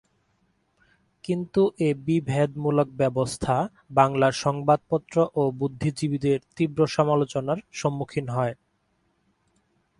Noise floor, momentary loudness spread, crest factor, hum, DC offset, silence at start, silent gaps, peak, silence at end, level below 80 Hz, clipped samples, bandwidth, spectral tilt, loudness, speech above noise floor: -70 dBFS; 7 LU; 22 dB; none; under 0.1%; 1.25 s; none; -4 dBFS; 1.45 s; -56 dBFS; under 0.1%; 11.5 kHz; -6.5 dB/octave; -25 LUFS; 46 dB